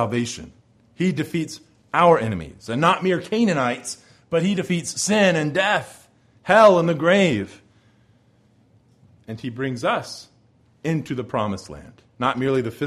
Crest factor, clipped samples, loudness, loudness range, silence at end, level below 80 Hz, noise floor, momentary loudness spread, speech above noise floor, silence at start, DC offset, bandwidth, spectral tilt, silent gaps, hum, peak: 20 dB; under 0.1%; -21 LUFS; 10 LU; 0 s; -56 dBFS; -58 dBFS; 19 LU; 38 dB; 0 s; under 0.1%; 14.5 kHz; -5 dB/octave; none; none; -2 dBFS